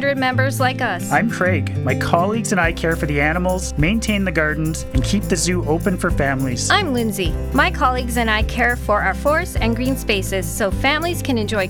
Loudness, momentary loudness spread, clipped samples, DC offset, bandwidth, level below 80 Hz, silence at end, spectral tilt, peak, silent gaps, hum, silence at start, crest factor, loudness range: -18 LUFS; 4 LU; under 0.1%; under 0.1%; 19 kHz; -28 dBFS; 0 s; -5 dB/octave; 0 dBFS; none; none; 0 s; 18 dB; 1 LU